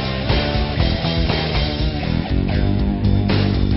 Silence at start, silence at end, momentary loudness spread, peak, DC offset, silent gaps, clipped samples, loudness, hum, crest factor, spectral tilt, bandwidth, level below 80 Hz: 0 s; 0 s; 3 LU; -4 dBFS; under 0.1%; none; under 0.1%; -19 LUFS; none; 14 dB; -5.5 dB/octave; 5.8 kHz; -24 dBFS